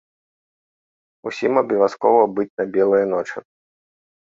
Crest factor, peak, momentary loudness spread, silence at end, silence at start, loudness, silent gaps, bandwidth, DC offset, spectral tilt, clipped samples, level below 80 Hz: 20 dB; -2 dBFS; 15 LU; 0.95 s; 1.25 s; -19 LUFS; 2.50-2.57 s; 7.6 kHz; under 0.1%; -6.5 dB/octave; under 0.1%; -66 dBFS